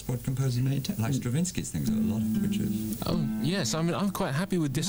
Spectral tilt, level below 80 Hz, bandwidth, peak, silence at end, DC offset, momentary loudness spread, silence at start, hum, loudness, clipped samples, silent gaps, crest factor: -5.5 dB/octave; -50 dBFS; over 20 kHz; -18 dBFS; 0 s; under 0.1%; 3 LU; 0 s; none; -29 LUFS; under 0.1%; none; 10 dB